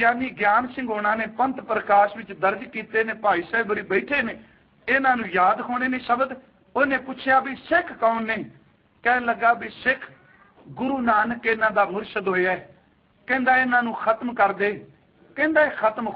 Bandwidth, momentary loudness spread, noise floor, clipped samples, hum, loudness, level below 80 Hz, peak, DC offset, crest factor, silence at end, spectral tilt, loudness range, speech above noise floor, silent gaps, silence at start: 5.6 kHz; 9 LU; -59 dBFS; under 0.1%; none; -22 LUFS; -60 dBFS; -6 dBFS; under 0.1%; 18 dB; 0 s; -8 dB/octave; 2 LU; 37 dB; none; 0 s